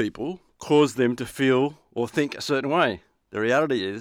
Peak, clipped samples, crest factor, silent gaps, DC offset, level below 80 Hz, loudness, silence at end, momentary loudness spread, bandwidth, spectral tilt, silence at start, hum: -8 dBFS; under 0.1%; 16 dB; none; under 0.1%; -62 dBFS; -24 LUFS; 0 s; 13 LU; 16 kHz; -5.5 dB/octave; 0 s; none